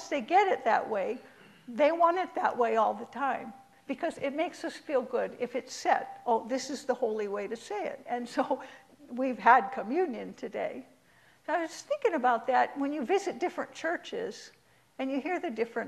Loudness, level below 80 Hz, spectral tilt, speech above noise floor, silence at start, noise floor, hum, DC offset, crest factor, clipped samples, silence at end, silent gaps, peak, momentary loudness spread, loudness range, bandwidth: -30 LUFS; -78 dBFS; -4 dB/octave; 32 dB; 0 s; -63 dBFS; none; under 0.1%; 22 dB; under 0.1%; 0 s; none; -8 dBFS; 12 LU; 4 LU; 13 kHz